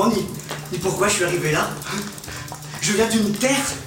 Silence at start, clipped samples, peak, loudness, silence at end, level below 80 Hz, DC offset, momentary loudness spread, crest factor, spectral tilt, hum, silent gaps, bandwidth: 0 s; under 0.1%; -4 dBFS; -21 LUFS; 0 s; -50 dBFS; under 0.1%; 13 LU; 18 dB; -3.5 dB/octave; none; none; 17 kHz